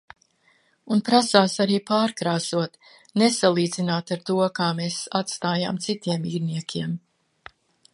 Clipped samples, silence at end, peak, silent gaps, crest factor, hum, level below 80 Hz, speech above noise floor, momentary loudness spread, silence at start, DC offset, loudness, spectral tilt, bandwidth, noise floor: under 0.1%; 0.95 s; 0 dBFS; none; 24 dB; none; -68 dBFS; 40 dB; 10 LU; 0.85 s; under 0.1%; -23 LUFS; -4.5 dB/octave; 11.5 kHz; -63 dBFS